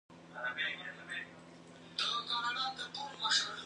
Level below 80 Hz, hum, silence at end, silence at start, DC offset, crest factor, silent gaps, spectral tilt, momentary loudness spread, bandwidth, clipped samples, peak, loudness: -78 dBFS; none; 0 s; 0.1 s; under 0.1%; 20 dB; none; -0.5 dB/octave; 20 LU; 11 kHz; under 0.1%; -18 dBFS; -36 LUFS